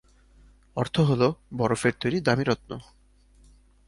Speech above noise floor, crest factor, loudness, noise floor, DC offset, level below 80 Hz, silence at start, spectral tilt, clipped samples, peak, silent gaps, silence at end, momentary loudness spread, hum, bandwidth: 32 dB; 20 dB; -25 LUFS; -57 dBFS; under 0.1%; -54 dBFS; 0.75 s; -6 dB/octave; under 0.1%; -6 dBFS; none; 1.05 s; 13 LU; none; 11.5 kHz